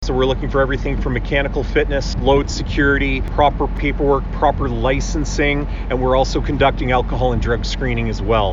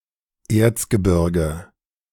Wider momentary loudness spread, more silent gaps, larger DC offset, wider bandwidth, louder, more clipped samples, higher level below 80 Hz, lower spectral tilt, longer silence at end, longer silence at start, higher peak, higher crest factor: second, 5 LU vs 8 LU; neither; neither; second, 7.6 kHz vs 18 kHz; about the same, -18 LUFS vs -19 LUFS; neither; first, -22 dBFS vs -36 dBFS; about the same, -6 dB/octave vs -6.5 dB/octave; second, 0 s vs 0.5 s; second, 0 s vs 0.5 s; about the same, -2 dBFS vs -4 dBFS; about the same, 16 dB vs 18 dB